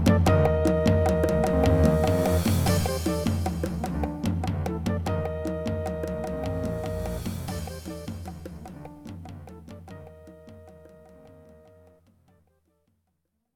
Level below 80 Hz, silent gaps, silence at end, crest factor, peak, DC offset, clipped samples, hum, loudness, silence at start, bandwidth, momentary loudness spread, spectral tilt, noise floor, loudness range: -38 dBFS; none; 2.25 s; 20 dB; -6 dBFS; under 0.1%; under 0.1%; none; -26 LUFS; 0 s; 18.5 kHz; 21 LU; -6.5 dB/octave; -76 dBFS; 22 LU